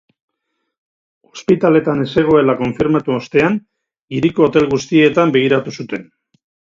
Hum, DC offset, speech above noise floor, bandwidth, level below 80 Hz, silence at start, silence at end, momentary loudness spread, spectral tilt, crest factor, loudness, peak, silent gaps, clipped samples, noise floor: none; under 0.1%; 59 dB; 7.6 kHz; -50 dBFS; 1.35 s; 0.65 s; 13 LU; -6.5 dB/octave; 16 dB; -15 LUFS; 0 dBFS; 4.01-4.08 s; under 0.1%; -73 dBFS